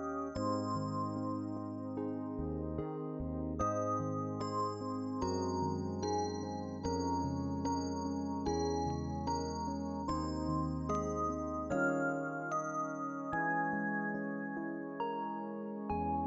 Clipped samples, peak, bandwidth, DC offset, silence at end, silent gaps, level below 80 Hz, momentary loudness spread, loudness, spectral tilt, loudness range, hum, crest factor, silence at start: under 0.1%; -22 dBFS; 7.6 kHz; under 0.1%; 0 s; none; -56 dBFS; 6 LU; -37 LUFS; -6 dB/octave; 2 LU; none; 16 dB; 0 s